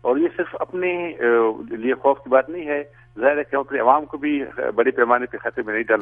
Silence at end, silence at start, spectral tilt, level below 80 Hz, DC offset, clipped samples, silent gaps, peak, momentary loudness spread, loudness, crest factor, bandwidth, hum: 0 s; 0.05 s; -8.5 dB/octave; -58 dBFS; under 0.1%; under 0.1%; none; -2 dBFS; 9 LU; -21 LUFS; 20 dB; 3.7 kHz; none